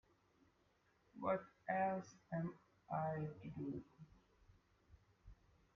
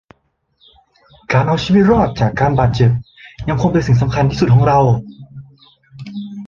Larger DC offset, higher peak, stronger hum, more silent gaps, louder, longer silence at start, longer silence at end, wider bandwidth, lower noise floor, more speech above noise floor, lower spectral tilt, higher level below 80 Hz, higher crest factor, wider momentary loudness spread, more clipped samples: neither; second, -28 dBFS vs -2 dBFS; neither; neither; second, -45 LUFS vs -14 LUFS; second, 1.15 s vs 1.3 s; first, 0.45 s vs 0 s; about the same, 7 kHz vs 7.2 kHz; first, -78 dBFS vs -63 dBFS; second, 34 dB vs 50 dB; about the same, -7.5 dB/octave vs -8 dB/octave; second, -74 dBFS vs -36 dBFS; first, 20 dB vs 14 dB; first, 24 LU vs 17 LU; neither